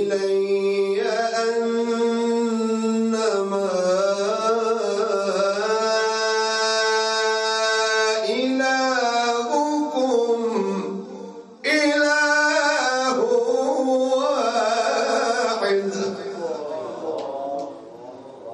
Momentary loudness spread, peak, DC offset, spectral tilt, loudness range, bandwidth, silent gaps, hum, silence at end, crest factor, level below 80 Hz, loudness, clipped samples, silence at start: 10 LU; -8 dBFS; under 0.1%; -3 dB/octave; 3 LU; 11 kHz; none; none; 0 s; 14 dB; -76 dBFS; -21 LUFS; under 0.1%; 0 s